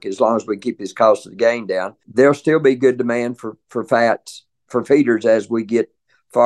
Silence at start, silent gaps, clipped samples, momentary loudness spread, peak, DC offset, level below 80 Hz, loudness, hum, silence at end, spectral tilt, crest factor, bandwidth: 0.05 s; none; under 0.1%; 11 LU; -2 dBFS; under 0.1%; -66 dBFS; -18 LUFS; none; 0 s; -6 dB/octave; 16 dB; 12 kHz